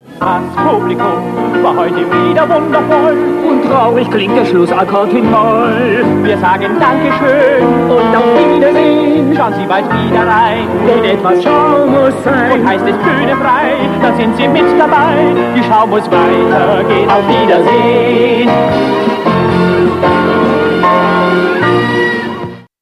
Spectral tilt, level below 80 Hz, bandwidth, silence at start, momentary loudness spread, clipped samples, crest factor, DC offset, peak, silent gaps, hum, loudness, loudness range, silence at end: -7 dB/octave; -42 dBFS; 13 kHz; 0.1 s; 4 LU; 0.2%; 10 dB; under 0.1%; 0 dBFS; none; none; -10 LUFS; 1 LU; 0.2 s